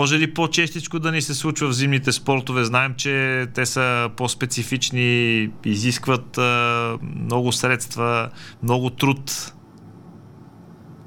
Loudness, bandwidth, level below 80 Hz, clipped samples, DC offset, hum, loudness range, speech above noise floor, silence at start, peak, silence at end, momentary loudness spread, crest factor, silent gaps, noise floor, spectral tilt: -21 LUFS; 18 kHz; -56 dBFS; under 0.1%; under 0.1%; none; 3 LU; 23 dB; 0 s; -2 dBFS; 0.05 s; 6 LU; 20 dB; none; -44 dBFS; -4 dB/octave